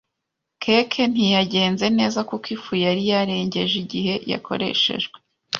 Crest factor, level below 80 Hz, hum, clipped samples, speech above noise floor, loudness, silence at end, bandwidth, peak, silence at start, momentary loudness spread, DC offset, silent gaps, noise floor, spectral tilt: 20 dB; -60 dBFS; none; under 0.1%; 59 dB; -21 LUFS; 0 s; 7.2 kHz; -2 dBFS; 0.6 s; 9 LU; under 0.1%; none; -80 dBFS; -5 dB/octave